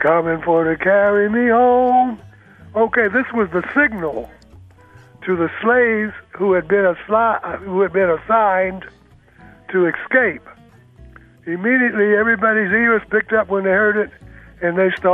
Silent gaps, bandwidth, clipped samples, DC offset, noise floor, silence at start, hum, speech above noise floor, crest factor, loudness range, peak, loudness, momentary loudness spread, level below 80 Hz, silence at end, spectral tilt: none; 4 kHz; under 0.1%; under 0.1%; -46 dBFS; 0 s; none; 30 dB; 16 dB; 4 LU; -2 dBFS; -16 LUFS; 10 LU; -50 dBFS; 0 s; -8.5 dB/octave